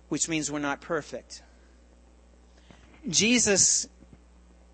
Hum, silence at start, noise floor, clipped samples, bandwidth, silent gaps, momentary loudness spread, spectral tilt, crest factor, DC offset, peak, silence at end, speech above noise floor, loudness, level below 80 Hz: 60 Hz at -55 dBFS; 0.1 s; -56 dBFS; under 0.1%; 8.8 kHz; none; 22 LU; -2 dB/octave; 20 dB; under 0.1%; -10 dBFS; 0.85 s; 29 dB; -24 LUFS; -56 dBFS